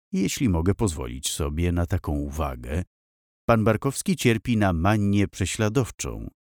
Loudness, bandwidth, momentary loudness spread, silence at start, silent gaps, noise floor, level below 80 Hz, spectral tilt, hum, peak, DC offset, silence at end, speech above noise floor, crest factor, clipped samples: -25 LUFS; 19.5 kHz; 10 LU; 0.1 s; 2.87-3.48 s; under -90 dBFS; -38 dBFS; -5.5 dB/octave; none; -6 dBFS; under 0.1%; 0.25 s; over 66 dB; 18 dB; under 0.1%